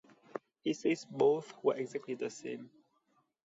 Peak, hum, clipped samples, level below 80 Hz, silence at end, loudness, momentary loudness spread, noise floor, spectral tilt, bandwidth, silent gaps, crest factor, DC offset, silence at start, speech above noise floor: -18 dBFS; none; under 0.1%; -86 dBFS; 0.8 s; -35 LUFS; 17 LU; -76 dBFS; -5.5 dB/octave; 8 kHz; none; 18 dB; under 0.1%; 0.35 s; 42 dB